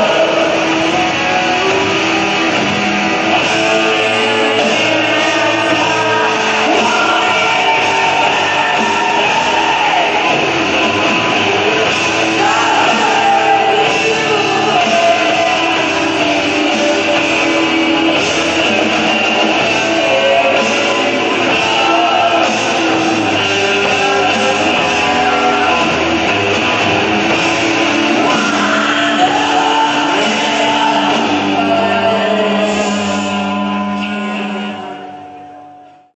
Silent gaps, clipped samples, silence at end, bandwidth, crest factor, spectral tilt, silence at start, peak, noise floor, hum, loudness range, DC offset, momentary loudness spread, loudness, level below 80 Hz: none; under 0.1%; 0.3 s; 9.4 kHz; 12 dB; -3 dB/octave; 0 s; 0 dBFS; -38 dBFS; none; 1 LU; under 0.1%; 2 LU; -12 LUFS; -46 dBFS